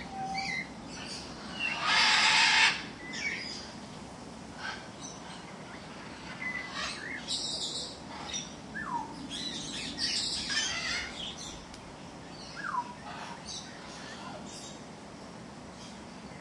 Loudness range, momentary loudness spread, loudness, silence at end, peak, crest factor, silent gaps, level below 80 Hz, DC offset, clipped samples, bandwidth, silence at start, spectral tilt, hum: 14 LU; 21 LU; -31 LUFS; 0 s; -10 dBFS; 24 dB; none; -60 dBFS; under 0.1%; under 0.1%; 12 kHz; 0 s; -1 dB/octave; none